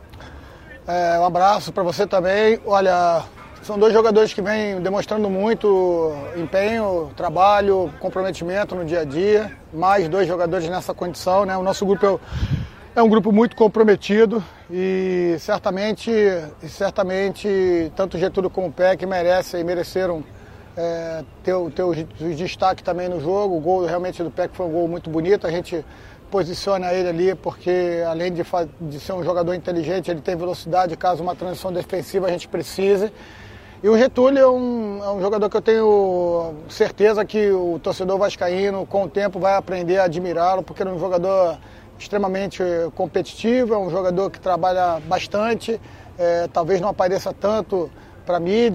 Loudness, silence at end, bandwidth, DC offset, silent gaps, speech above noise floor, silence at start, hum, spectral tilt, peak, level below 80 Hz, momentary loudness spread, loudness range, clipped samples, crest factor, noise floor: -20 LUFS; 0 s; 15 kHz; under 0.1%; none; 21 dB; 0 s; none; -6 dB/octave; -2 dBFS; -46 dBFS; 10 LU; 5 LU; under 0.1%; 18 dB; -40 dBFS